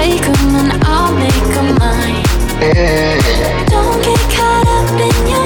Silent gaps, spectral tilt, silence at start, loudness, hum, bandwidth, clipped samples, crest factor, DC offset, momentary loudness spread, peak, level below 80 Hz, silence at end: none; -5 dB/octave; 0 s; -12 LUFS; none; over 20 kHz; under 0.1%; 10 dB; under 0.1%; 3 LU; -2 dBFS; -16 dBFS; 0 s